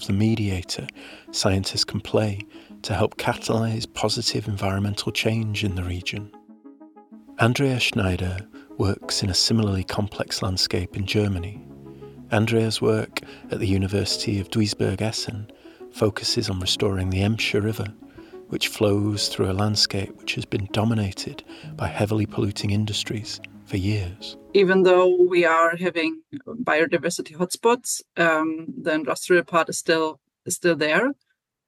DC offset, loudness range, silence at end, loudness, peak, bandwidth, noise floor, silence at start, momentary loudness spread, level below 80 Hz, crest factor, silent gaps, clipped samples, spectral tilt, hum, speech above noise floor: under 0.1%; 5 LU; 0.55 s; -23 LUFS; -2 dBFS; 16 kHz; -47 dBFS; 0 s; 14 LU; -52 dBFS; 20 dB; none; under 0.1%; -4.5 dB/octave; none; 24 dB